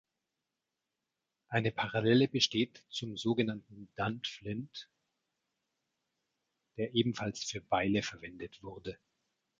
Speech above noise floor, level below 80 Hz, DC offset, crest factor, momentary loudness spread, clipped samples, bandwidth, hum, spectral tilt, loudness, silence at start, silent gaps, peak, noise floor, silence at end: 54 dB; -66 dBFS; under 0.1%; 22 dB; 18 LU; under 0.1%; 7.8 kHz; none; -5 dB/octave; -33 LUFS; 1.5 s; none; -14 dBFS; -88 dBFS; 0.65 s